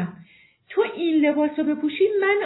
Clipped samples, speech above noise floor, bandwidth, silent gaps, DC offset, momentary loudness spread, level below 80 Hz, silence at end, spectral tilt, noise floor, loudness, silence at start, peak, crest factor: under 0.1%; 32 dB; 4.1 kHz; none; under 0.1%; 6 LU; -70 dBFS; 0 s; -9.5 dB/octave; -52 dBFS; -22 LUFS; 0 s; -10 dBFS; 14 dB